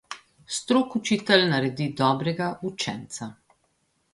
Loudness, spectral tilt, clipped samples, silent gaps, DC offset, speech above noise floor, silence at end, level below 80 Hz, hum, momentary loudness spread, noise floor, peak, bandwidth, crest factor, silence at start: -24 LUFS; -4.5 dB/octave; under 0.1%; none; under 0.1%; 46 dB; 0.8 s; -64 dBFS; none; 17 LU; -70 dBFS; -4 dBFS; 11.5 kHz; 22 dB; 0.1 s